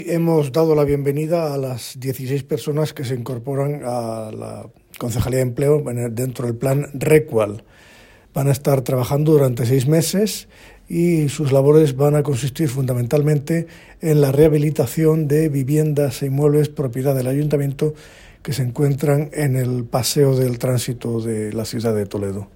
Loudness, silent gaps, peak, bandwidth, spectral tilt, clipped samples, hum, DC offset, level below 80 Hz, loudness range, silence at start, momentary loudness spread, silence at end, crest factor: -19 LUFS; none; 0 dBFS; 16.5 kHz; -6.5 dB/octave; under 0.1%; none; under 0.1%; -46 dBFS; 5 LU; 0 s; 10 LU; 0.1 s; 18 dB